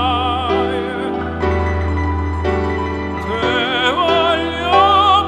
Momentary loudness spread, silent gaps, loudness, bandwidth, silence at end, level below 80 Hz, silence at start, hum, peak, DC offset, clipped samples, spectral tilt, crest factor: 9 LU; none; -16 LUFS; 10 kHz; 0 s; -28 dBFS; 0 s; none; -2 dBFS; under 0.1%; under 0.1%; -6 dB/octave; 14 dB